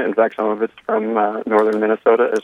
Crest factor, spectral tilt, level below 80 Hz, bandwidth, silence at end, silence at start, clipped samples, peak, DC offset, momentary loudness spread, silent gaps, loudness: 16 dB; -6.5 dB/octave; -70 dBFS; 10 kHz; 0.05 s; 0 s; under 0.1%; -2 dBFS; under 0.1%; 6 LU; none; -18 LUFS